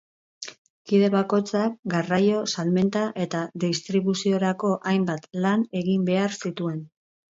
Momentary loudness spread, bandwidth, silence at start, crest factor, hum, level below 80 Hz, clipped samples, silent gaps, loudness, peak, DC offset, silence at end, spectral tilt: 8 LU; 7.8 kHz; 0.4 s; 16 dB; none; -68 dBFS; under 0.1%; 0.58-0.85 s, 1.79-1.83 s; -24 LUFS; -10 dBFS; under 0.1%; 0.5 s; -6 dB/octave